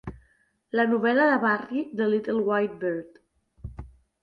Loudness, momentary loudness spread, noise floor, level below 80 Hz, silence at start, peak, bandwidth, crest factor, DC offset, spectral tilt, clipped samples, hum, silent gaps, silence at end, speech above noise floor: -25 LUFS; 22 LU; -66 dBFS; -52 dBFS; 0.05 s; -10 dBFS; 5.2 kHz; 16 dB; under 0.1%; -8 dB/octave; under 0.1%; none; none; 0.35 s; 42 dB